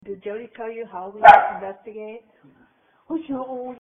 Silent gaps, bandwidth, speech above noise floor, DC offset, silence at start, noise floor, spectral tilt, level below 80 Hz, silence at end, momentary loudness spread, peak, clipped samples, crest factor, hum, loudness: none; 7.6 kHz; 39 dB; under 0.1%; 0.05 s; -59 dBFS; -1.5 dB/octave; -56 dBFS; 0.05 s; 25 LU; 0 dBFS; under 0.1%; 20 dB; none; -15 LUFS